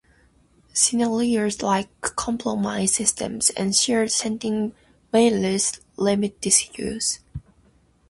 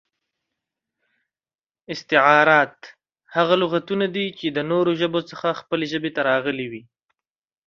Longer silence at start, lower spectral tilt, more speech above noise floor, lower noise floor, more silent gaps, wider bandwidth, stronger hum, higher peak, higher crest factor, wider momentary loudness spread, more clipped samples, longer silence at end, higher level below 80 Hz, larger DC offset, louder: second, 0.75 s vs 1.9 s; second, -3 dB/octave vs -6 dB/octave; second, 36 dB vs over 69 dB; second, -59 dBFS vs under -90 dBFS; neither; first, 12 kHz vs 7.2 kHz; neither; second, -4 dBFS vs 0 dBFS; about the same, 20 dB vs 22 dB; second, 9 LU vs 13 LU; neither; second, 0.7 s vs 0.85 s; first, -52 dBFS vs -68 dBFS; neither; about the same, -22 LUFS vs -20 LUFS